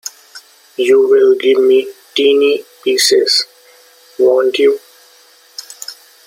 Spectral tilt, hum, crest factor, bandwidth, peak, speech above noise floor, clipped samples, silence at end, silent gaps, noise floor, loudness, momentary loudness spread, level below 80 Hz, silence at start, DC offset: -1 dB/octave; none; 14 dB; 16.5 kHz; 0 dBFS; 35 dB; under 0.1%; 0.35 s; none; -46 dBFS; -12 LUFS; 20 LU; -68 dBFS; 0.05 s; under 0.1%